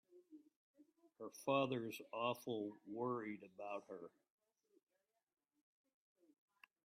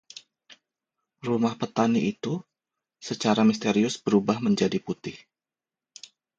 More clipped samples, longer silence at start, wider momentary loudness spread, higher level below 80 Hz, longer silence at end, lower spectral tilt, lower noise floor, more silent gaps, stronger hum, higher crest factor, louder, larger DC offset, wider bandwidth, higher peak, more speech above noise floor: neither; second, 0.15 s vs 0.5 s; second, 17 LU vs 22 LU; second, under -90 dBFS vs -66 dBFS; first, 2.8 s vs 1.2 s; about the same, -5.5 dB/octave vs -5.5 dB/octave; second, -66 dBFS vs under -90 dBFS; first, 0.56-0.74 s vs none; neither; about the same, 22 dB vs 20 dB; second, -45 LUFS vs -25 LUFS; neither; first, 13.5 kHz vs 8.6 kHz; second, -26 dBFS vs -6 dBFS; second, 21 dB vs over 65 dB